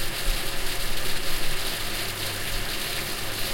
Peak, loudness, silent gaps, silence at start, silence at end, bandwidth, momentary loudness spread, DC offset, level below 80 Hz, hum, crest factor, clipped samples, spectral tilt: -12 dBFS; -28 LUFS; none; 0 s; 0 s; 16.5 kHz; 1 LU; under 0.1%; -32 dBFS; none; 14 dB; under 0.1%; -2 dB/octave